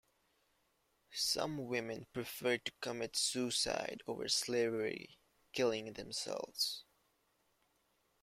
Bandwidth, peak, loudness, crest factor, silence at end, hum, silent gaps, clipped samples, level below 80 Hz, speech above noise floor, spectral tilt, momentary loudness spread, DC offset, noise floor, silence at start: 16 kHz; -22 dBFS; -38 LUFS; 20 dB; 1.4 s; none; none; under 0.1%; -74 dBFS; 39 dB; -2.5 dB/octave; 9 LU; under 0.1%; -78 dBFS; 1.1 s